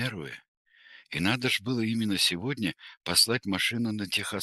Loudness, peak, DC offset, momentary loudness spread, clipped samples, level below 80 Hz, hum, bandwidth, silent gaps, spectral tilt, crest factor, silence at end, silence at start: -27 LUFS; -10 dBFS; under 0.1%; 15 LU; under 0.1%; -62 dBFS; none; 12.5 kHz; 0.48-0.65 s; -3 dB/octave; 20 dB; 0 s; 0 s